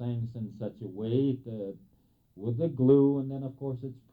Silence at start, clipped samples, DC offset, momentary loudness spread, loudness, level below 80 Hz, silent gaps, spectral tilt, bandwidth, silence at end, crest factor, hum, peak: 0 s; under 0.1%; under 0.1%; 16 LU; -30 LUFS; -66 dBFS; none; -12 dB/octave; 4.2 kHz; 0.2 s; 18 dB; none; -12 dBFS